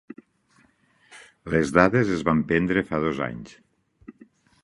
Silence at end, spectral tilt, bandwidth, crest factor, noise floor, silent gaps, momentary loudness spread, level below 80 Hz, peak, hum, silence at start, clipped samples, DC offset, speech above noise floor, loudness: 0.5 s; -7 dB/octave; 11.5 kHz; 24 dB; -62 dBFS; none; 19 LU; -50 dBFS; 0 dBFS; none; 1.1 s; under 0.1%; under 0.1%; 40 dB; -23 LUFS